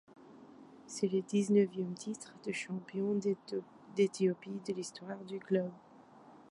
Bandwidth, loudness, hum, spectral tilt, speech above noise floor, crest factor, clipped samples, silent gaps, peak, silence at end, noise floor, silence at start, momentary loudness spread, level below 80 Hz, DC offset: 11.5 kHz; -36 LUFS; none; -6 dB/octave; 23 dB; 18 dB; under 0.1%; none; -18 dBFS; 0.15 s; -58 dBFS; 0.2 s; 15 LU; -82 dBFS; under 0.1%